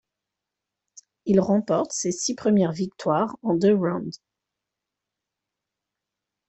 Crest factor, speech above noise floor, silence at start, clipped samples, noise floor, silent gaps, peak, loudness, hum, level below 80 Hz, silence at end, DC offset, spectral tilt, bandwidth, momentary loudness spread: 20 dB; 63 dB; 1.25 s; under 0.1%; -86 dBFS; none; -6 dBFS; -23 LUFS; 50 Hz at -50 dBFS; -66 dBFS; 2.35 s; under 0.1%; -5.5 dB/octave; 8.4 kHz; 8 LU